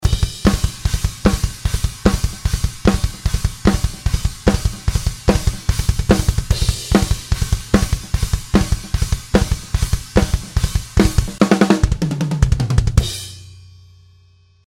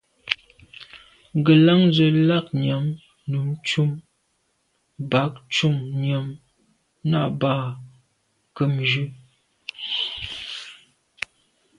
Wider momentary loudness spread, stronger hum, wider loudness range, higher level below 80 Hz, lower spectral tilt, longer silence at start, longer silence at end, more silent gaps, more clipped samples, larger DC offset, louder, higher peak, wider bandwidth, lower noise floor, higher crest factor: second, 5 LU vs 19 LU; neither; second, 2 LU vs 7 LU; first, -22 dBFS vs -60 dBFS; about the same, -5.5 dB/octave vs -6.5 dB/octave; second, 0 s vs 0.25 s; about the same, 1.05 s vs 1.05 s; neither; neither; neither; first, -19 LUFS vs -22 LUFS; about the same, 0 dBFS vs 0 dBFS; first, 16.5 kHz vs 10.5 kHz; second, -51 dBFS vs -69 dBFS; about the same, 18 dB vs 22 dB